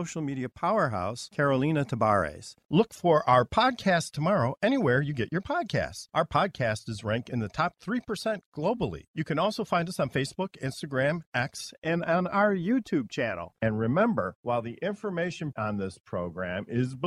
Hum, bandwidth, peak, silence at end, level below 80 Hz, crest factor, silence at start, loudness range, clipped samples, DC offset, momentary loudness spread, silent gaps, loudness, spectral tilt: none; 13.5 kHz; -10 dBFS; 0 s; -58 dBFS; 18 dB; 0 s; 5 LU; under 0.1%; under 0.1%; 9 LU; 2.65-2.69 s, 8.46-8.52 s, 9.08-9.14 s, 11.26-11.32 s, 11.78-11.82 s, 14.35-14.43 s, 16.00-16.04 s; -28 LUFS; -6 dB/octave